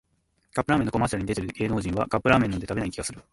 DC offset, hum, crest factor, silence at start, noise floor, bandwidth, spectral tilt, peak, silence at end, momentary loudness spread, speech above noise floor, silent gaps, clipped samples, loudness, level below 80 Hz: under 0.1%; none; 22 dB; 0.55 s; -70 dBFS; 11.5 kHz; -6 dB/octave; -4 dBFS; 0.1 s; 9 LU; 45 dB; none; under 0.1%; -26 LUFS; -44 dBFS